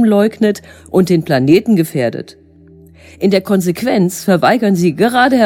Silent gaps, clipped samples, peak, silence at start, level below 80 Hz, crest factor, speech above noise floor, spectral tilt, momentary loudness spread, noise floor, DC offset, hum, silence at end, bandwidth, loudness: none; under 0.1%; 0 dBFS; 0 s; -50 dBFS; 12 dB; 29 dB; -6 dB/octave; 7 LU; -42 dBFS; under 0.1%; none; 0 s; 17 kHz; -13 LUFS